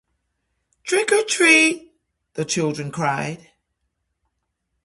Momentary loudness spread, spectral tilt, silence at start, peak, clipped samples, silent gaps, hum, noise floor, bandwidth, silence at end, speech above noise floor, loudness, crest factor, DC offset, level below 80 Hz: 21 LU; -3 dB/octave; 0.85 s; -2 dBFS; under 0.1%; none; none; -75 dBFS; 11.5 kHz; 1.5 s; 56 dB; -18 LUFS; 22 dB; under 0.1%; -64 dBFS